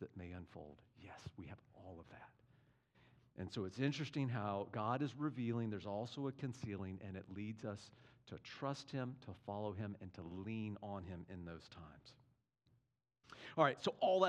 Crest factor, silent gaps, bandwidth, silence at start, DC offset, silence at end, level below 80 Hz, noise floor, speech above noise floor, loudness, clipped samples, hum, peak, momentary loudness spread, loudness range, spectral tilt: 26 dB; none; 10.5 kHz; 0 s; under 0.1%; 0 s; -78 dBFS; -82 dBFS; 38 dB; -44 LUFS; under 0.1%; none; -18 dBFS; 19 LU; 9 LU; -6.5 dB/octave